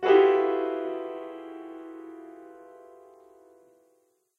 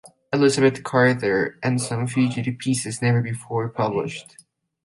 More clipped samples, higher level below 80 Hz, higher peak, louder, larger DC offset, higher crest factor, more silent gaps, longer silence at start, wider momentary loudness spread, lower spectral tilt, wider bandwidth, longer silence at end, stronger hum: neither; second, -82 dBFS vs -60 dBFS; second, -8 dBFS vs -2 dBFS; second, -25 LUFS vs -22 LUFS; neither; about the same, 20 dB vs 20 dB; neither; about the same, 0 s vs 0.05 s; first, 28 LU vs 9 LU; about the same, -5.5 dB/octave vs -5.5 dB/octave; second, 4.6 kHz vs 11.5 kHz; first, 1.85 s vs 0.65 s; neither